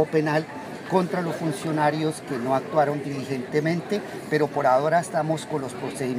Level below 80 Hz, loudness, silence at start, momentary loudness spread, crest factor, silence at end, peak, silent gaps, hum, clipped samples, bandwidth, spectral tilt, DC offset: -68 dBFS; -25 LUFS; 0 s; 9 LU; 18 dB; 0 s; -8 dBFS; none; none; under 0.1%; 15.5 kHz; -6 dB/octave; under 0.1%